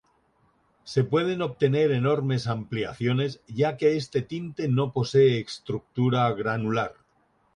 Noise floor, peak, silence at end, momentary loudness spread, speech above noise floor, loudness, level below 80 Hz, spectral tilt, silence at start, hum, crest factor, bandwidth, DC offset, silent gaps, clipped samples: -67 dBFS; -10 dBFS; 0.65 s; 9 LU; 42 dB; -26 LUFS; -60 dBFS; -7 dB/octave; 0.85 s; none; 16 dB; 10.5 kHz; under 0.1%; none; under 0.1%